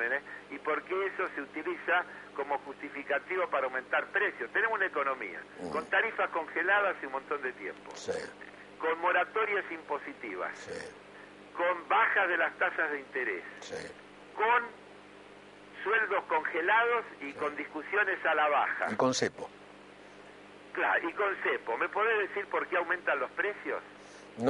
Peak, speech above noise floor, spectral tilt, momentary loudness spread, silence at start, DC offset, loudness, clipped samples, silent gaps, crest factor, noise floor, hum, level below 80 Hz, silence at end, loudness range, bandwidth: -14 dBFS; 21 dB; -3.5 dB/octave; 20 LU; 0 s; under 0.1%; -31 LUFS; under 0.1%; none; 18 dB; -53 dBFS; 50 Hz at -65 dBFS; -74 dBFS; 0 s; 4 LU; 11 kHz